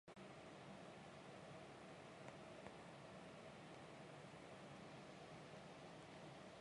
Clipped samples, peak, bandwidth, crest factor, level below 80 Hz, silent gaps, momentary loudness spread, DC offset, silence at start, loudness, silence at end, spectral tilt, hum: under 0.1%; -40 dBFS; 11 kHz; 20 dB; -82 dBFS; none; 1 LU; under 0.1%; 0.05 s; -59 LUFS; 0 s; -5 dB/octave; none